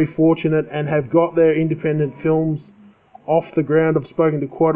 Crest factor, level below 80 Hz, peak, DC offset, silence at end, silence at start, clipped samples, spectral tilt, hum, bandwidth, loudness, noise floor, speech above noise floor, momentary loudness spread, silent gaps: 14 dB; -56 dBFS; -4 dBFS; under 0.1%; 0 s; 0 s; under 0.1%; -12 dB/octave; none; 3.7 kHz; -18 LUFS; -46 dBFS; 29 dB; 5 LU; none